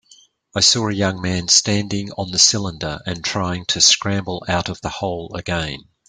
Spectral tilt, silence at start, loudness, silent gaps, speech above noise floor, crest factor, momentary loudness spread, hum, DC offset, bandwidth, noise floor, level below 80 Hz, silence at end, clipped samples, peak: -2.5 dB/octave; 0.55 s; -18 LUFS; none; 32 dB; 20 dB; 12 LU; none; under 0.1%; 11 kHz; -52 dBFS; -48 dBFS; 0.3 s; under 0.1%; 0 dBFS